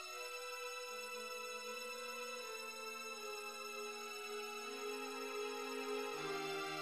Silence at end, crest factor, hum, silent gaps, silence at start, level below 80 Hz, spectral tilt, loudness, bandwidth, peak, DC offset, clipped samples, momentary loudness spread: 0 s; 16 dB; none; none; 0 s; -88 dBFS; -1.5 dB/octave; -45 LUFS; 15.5 kHz; -30 dBFS; under 0.1%; under 0.1%; 3 LU